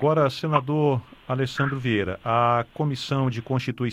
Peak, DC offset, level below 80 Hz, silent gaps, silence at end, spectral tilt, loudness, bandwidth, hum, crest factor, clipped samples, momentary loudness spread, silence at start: -6 dBFS; under 0.1%; -56 dBFS; none; 0 s; -7 dB/octave; -24 LUFS; 12.5 kHz; none; 18 dB; under 0.1%; 6 LU; 0 s